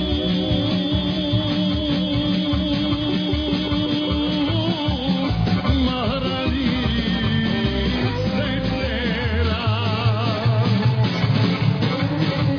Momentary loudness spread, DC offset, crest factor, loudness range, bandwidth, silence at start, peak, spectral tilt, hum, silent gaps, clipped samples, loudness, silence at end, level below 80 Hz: 3 LU; under 0.1%; 14 dB; 1 LU; 5.4 kHz; 0 s; -6 dBFS; -7.5 dB/octave; none; none; under 0.1%; -21 LUFS; 0 s; -32 dBFS